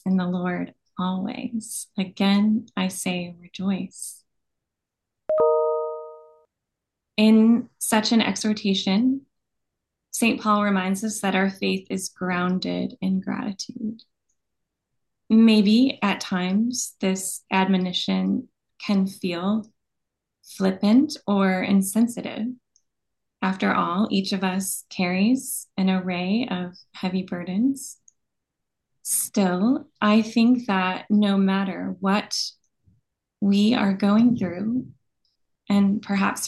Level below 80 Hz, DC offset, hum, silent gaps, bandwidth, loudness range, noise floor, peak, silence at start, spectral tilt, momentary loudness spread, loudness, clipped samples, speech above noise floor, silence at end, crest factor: -68 dBFS; under 0.1%; none; none; 12.5 kHz; 5 LU; -84 dBFS; -6 dBFS; 0.05 s; -5 dB/octave; 12 LU; -23 LUFS; under 0.1%; 62 dB; 0 s; 18 dB